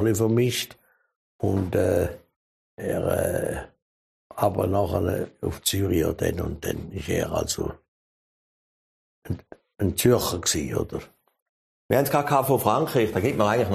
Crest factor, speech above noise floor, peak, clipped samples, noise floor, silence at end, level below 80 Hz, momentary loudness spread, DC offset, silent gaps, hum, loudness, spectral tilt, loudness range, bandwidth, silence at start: 22 dB; over 66 dB; -4 dBFS; under 0.1%; under -90 dBFS; 0 s; -46 dBFS; 12 LU; under 0.1%; 1.16-1.39 s, 2.36-2.77 s, 3.82-4.30 s, 7.88-9.22 s, 11.42-11.89 s; none; -25 LUFS; -5 dB/octave; 5 LU; 15 kHz; 0 s